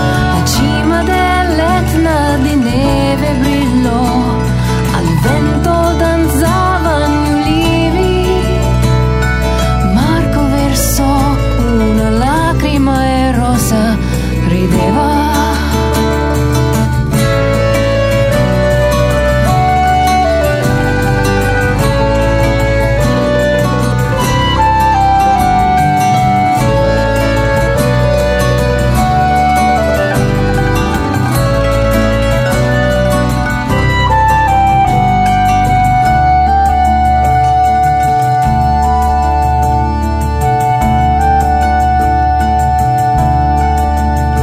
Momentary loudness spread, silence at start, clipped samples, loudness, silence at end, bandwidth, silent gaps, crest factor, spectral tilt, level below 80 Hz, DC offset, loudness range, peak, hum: 3 LU; 0 s; under 0.1%; -11 LUFS; 0 s; 16 kHz; none; 10 dB; -6 dB/octave; -18 dBFS; under 0.1%; 2 LU; 0 dBFS; none